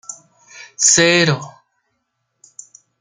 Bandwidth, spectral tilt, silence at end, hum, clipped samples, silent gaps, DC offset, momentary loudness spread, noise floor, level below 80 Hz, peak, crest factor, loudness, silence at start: 10.5 kHz; -2.5 dB/octave; 1.5 s; none; under 0.1%; none; under 0.1%; 26 LU; -72 dBFS; -58 dBFS; -2 dBFS; 18 dB; -13 LUFS; 0.1 s